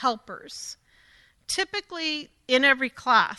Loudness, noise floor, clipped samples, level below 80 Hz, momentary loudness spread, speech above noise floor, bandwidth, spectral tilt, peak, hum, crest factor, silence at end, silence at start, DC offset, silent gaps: -24 LUFS; -59 dBFS; under 0.1%; -64 dBFS; 18 LU; 33 dB; 12.5 kHz; -1.5 dB/octave; -6 dBFS; none; 20 dB; 0 s; 0 s; under 0.1%; none